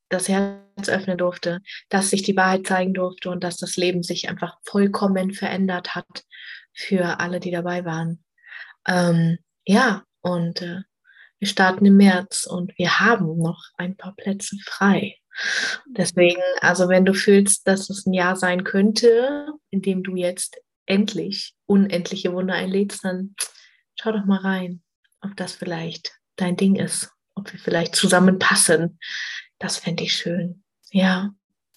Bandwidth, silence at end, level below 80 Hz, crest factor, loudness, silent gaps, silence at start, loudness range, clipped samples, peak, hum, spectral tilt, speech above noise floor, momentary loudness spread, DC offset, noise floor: 12.5 kHz; 0.45 s; -68 dBFS; 18 dB; -21 LUFS; 20.76-20.86 s, 24.95-25.03 s; 0.1 s; 7 LU; under 0.1%; -2 dBFS; none; -4.5 dB/octave; 33 dB; 15 LU; under 0.1%; -53 dBFS